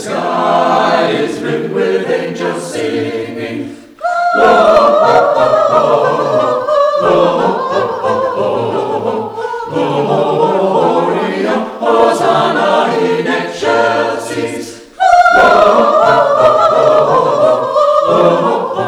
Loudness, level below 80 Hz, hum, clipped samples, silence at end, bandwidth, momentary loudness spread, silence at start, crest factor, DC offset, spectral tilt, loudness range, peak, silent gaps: -11 LUFS; -50 dBFS; none; 0.3%; 0 s; 13 kHz; 10 LU; 0 s; 12 dB; under 0.1%; -5 dB/octave; 6 LU; 0 dBFS; none